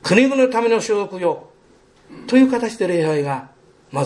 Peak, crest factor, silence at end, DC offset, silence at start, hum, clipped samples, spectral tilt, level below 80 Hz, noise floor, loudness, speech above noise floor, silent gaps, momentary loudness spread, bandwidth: -2 dBFS; 18 dB; 0 s; under 0.1%; 0.05 s; none; under 0.1%; -5.5 dB/octave; -62 dBFS; -52 dBFS; -18 LUFS; 35 dB; none; 14 LU; 11.5 kHz